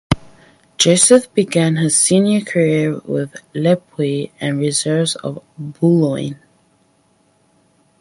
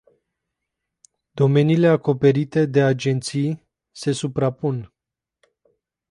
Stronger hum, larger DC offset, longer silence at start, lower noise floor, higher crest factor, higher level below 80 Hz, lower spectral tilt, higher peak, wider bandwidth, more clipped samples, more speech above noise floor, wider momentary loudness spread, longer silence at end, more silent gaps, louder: neither; neither; second, 0.1 s vs 1.35 s; second, -58 dBFS vs -86 dBFS; about the same, 18 dB vs 18 dB; first, -46 dBFS vs -60 dBFS; second, -4.5 dB/octave vs -7 dB/octave; first, 0 dBFS vs -4 dBFS; about the same, 11.5 kHz vs 11.5 kHz; neither; second, 42 dB vs 67 dB; first, 14 LU vs 11 LU; first, 1.65 s vs 1.25 s; neither; first, -16 LUFS vs -20 LUFS